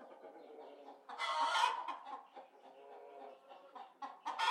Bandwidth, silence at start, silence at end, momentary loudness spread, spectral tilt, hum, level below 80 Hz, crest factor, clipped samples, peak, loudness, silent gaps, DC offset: 14 kHz; 0 s; 0 s; 23 LU; 1.5 dB/octave; none; under -90 dBFS; 24 dB; under 0.1%; -20 dBFS; -39 LUFS; none; under 0.1%